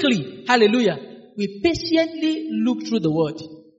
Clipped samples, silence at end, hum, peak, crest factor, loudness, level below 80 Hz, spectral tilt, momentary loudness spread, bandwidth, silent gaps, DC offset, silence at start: under 0.1%; 0.2 s; none; -2 dBFS; 18 dB; -21 LUFS; -54 dBFS; -4 dB/octave; 12 LU; 8 kHz; none; under 0.1%; 0 s